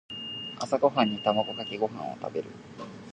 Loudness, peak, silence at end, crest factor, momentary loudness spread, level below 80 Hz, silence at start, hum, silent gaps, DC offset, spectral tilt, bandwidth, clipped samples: -29 LUFS; -8 dBFS; 0 s; 22 dB; 18 LU; -68 dBFS; 0.1 s; none; none; under 0.1%; -5 dB/octave; 9.8 kHz; under 0.1%